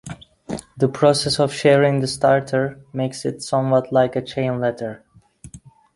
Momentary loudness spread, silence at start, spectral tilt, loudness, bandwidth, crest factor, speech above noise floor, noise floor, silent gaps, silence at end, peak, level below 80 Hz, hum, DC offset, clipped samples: 16 LU; 0.05 s; -5.5 dB/octave; -19 LUFS; 11.5 kHz; 18 dB; 25 dB; -44 dBFS; none; 0.25 s; -2 dBFS; -54 dBFS; none; under 0.1%; under 0.1%